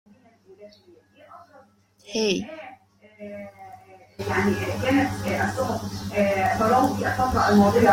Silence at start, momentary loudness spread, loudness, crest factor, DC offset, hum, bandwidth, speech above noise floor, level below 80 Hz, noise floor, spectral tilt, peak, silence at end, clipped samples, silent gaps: 0.5 s; 21 LU; -23 LUFS; 18 dB; under 0.1%; none; 16.5 kHz; 30 dB; -50 dBFS; -53 dBFS; -5.5 dB/octave; -6 dBFS; 0 s; under 0.1%; none